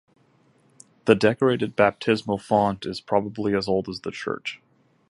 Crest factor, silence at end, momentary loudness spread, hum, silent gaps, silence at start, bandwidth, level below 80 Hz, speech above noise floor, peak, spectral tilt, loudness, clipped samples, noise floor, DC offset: 22 dB; 0.55 s; 12 LU; none; none; 1.05 s; 11.5 kHz; -58 dBFS; 38 dB; -2 dBFS; -6 dB/octave; -23 LUFS; under 0.1%; -61 dBFS; under 0.1%